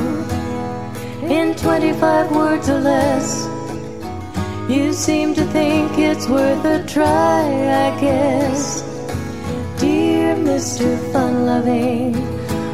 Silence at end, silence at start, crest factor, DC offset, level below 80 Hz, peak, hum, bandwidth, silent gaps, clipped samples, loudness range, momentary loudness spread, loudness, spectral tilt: 0 s; 0 s; 16 dB; 1%; -44 dBFS; -2 dBFS; none; 15.5 kHz; none; under 0.1%; 2 LU; 10 LU; -18 LUFS; -5.5 dB/octave